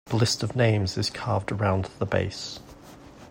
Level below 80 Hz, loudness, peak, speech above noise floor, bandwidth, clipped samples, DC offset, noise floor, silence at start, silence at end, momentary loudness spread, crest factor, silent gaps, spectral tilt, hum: -52 dBFS; -26 LUFS; -8 dBFS; 21 dB; 16 kHz; under 0.1%; under 0.1%; -47 dBFS; 0.05 s; 0 s; 10 LU; 18 dB; none; -5 dB/octave; none